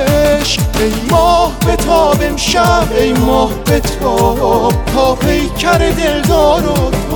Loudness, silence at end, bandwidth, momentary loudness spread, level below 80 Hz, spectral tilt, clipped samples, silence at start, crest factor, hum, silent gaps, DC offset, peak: -12 LUFS; 0 s; 19.5 kHz; 4 LU; -20 dBFS; -5 dB/octave; under 0.1%; 0 s; 10 dB; none; none; under 0.1%; 0 dBFS